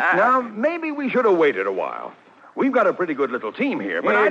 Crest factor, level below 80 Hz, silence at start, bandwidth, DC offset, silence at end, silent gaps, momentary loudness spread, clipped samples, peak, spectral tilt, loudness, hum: 14 dB; -74 dBFS; 0 s; 7.8 kHz; under 0.1%; 0 s; none; 10 LU; under 0.1%; -8 dBFS; -6.5 dB/octave; -21 LUFS; none